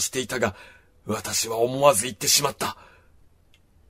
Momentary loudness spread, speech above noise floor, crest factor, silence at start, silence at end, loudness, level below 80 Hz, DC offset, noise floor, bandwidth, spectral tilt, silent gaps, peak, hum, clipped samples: 12 LU; 34 dB; 24 dB; 0 s; 1.15 s; -23 LUFS; -58 dBFS; under 0.1%; -58 dBFS; 16 kHz; -2 dB/octave; none; -2 dBFS; none; under 0.1%